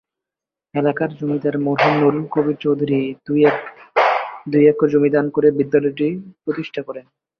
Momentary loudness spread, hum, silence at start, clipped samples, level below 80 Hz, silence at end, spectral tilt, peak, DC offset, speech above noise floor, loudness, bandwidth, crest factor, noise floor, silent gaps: 12 LU; none; 0.75 s; under 0.1%; -62 dBFS; 0.4 s; -8.5 dB/octave; -2 dBFS; under 0.1%; 70 dB; -18 LUFS; 6.2 kHz; 16 dB; -87 dBFS; none